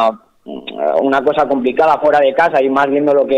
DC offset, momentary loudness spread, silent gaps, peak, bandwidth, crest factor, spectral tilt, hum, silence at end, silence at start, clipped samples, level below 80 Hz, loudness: under 0.1%; 16 LU; none; -4 dBFS; 8.6 kHz; 10 dB; -6 dB/octave; none; 0 s; 0 s; under 0.1%; -54 dBFS; -13 LUFS